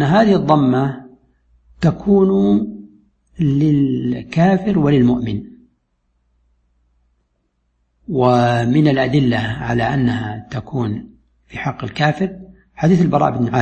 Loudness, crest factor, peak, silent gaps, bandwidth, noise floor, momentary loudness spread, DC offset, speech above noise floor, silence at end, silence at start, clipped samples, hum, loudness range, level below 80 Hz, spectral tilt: -16 LUFS; 16 dB; 0 dBFS; none; 8.6 kHz; -66 dBFS; 12 LU; under 0.1%; 51 dB; 0 s; 0 s; under 0.1%; none; 5 LU; -44 dBFS; -8 dB/octave